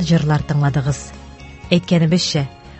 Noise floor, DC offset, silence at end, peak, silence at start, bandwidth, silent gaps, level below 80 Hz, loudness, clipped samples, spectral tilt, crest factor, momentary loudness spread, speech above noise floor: -36 dBFS; under 0.1%; 0 s; 0 dBFS; 0 s; 8.4 kHz; none; -40 dBFS; -18 LUFS; under 0.1%; -6 dB/octave; 18 dB; 21 LU; 20 dB